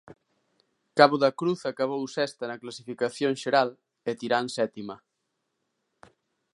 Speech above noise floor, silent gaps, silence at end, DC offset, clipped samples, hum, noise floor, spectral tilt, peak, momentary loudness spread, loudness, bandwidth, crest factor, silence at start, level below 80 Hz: 53 dB; none; 1.55 s; under 0.1%; under 0.1%; none; -79 dBFS; -5 dB/octave; -2 dBFS; 17 LU; -26 LUFS; 11.5 kHz; 26 dB; 0.95 s; -78 dBFS